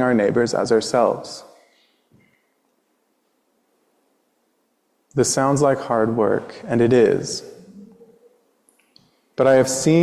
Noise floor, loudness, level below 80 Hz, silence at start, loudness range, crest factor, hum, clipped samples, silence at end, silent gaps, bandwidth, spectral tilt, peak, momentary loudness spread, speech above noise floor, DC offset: -68 dBFS; -19 LUFS; -58 dBFS; 0 s; 8 LU; 16 dB; none; under 0.1%; 0 s; none; 14 kHz; -5 dB/octave; -4 dBFS; 14 LU; 50 dB; under 0.1%